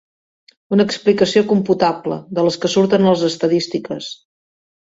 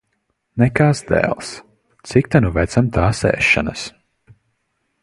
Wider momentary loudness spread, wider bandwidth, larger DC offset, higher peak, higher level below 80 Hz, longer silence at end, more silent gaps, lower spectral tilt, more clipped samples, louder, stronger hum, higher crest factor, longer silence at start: second, 11 LU vs 16 LU; second, 8 kHz vs 11.5 kHz; neither; about the same, 0 dBFS vs 0 dBFS; second, -58 dBFS vs -34 dBFS; second, 0.7 s vs 1.15 s; neither; about the same, -5.5 dB/octave vs -6 dB/octave; neither; about the same, -16 LUFS vs -17 LUFS; neither; about the same, 16 dB vs 18 dB; first, 0.7 s vs 0.55 s